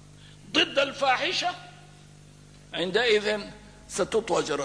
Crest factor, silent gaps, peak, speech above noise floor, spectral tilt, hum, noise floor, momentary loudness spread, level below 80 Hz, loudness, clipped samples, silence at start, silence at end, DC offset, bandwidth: 18 dB; none; -10 dBFS; 24 dB; -2.5 dB/octave; 50 Hz at -50 dBFS; -51 dBFS; 13 LU; -58 dBFS; -26 LUFS; under 0.1%; 0.1 s; 0 s; under 0.1%; 11 kHz